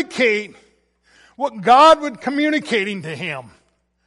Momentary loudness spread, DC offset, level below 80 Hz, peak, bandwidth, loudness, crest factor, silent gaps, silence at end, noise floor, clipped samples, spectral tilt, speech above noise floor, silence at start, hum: 16 LU; under 0.1%; -60 dBFS; -2 dBFS; 11.5 kHz; -17 LUFS; 16 dB; none; 0.65 s; -59 dBFS; under 0.1%; -4 dB/octave; 42 dB; 0 s; none